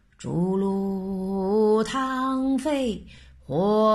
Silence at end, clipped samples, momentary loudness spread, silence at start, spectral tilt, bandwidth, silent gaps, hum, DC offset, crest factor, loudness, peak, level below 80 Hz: 0 s; under 0.1%; 9 LU; 0.2 s; -7 dB/octave; 12.5 kHz; none; none; under 0.1%; 14 dB; -25 LUFS; -10 dBFS; -50 dBFS